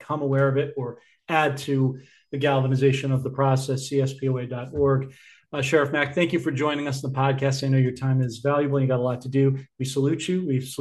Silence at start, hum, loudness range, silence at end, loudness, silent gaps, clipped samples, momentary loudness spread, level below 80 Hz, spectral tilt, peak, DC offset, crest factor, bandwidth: 0 s; none; 1 LU; 0.05 s; -24 LUFS; none; under 0.1%; 7 LU; -58 dBFS; -6.5 dB/octave; -6 dBFS; under 0.1%; 18 dB; 12.5 kHz